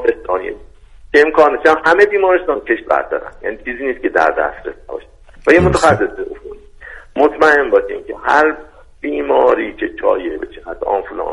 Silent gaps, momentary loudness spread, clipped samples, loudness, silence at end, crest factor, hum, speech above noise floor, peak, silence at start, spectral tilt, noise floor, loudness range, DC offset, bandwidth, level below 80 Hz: none; 17 LU; under 0.1%; -14 LUFS; 0 s; 16 dB; none; 25 dB; 0 dBFS; 0 s; -5.5 dB/octave; -39 dBFS; 3 LU; under 0.1%; 11.5 kHz; -38 dBFS